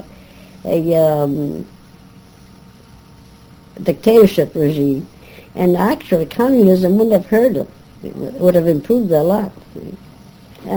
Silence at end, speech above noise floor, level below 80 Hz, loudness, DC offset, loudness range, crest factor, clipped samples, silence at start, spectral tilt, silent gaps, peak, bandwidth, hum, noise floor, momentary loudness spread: 0 s; 28 dB; -48 dBFS; -15 LUFS; under 0.1%; 6 LU; 16 dB; under 0.1%; 0.65 s; -8 dB/octave; none; 0 dBFS; over 20 kHz; none; -43 dBFS; 21 LU